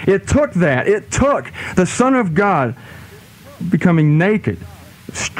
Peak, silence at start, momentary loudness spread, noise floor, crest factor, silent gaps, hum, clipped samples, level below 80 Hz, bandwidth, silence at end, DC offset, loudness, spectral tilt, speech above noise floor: -2 dBFS; 0 s; 16 LU; -40 dBFS; 14 dB; none; none; under 0.1%; -38 dBFS; 15 kHz; 0 s; under 0.1%; -16 LUFS; -6 dB/octave; 24 dB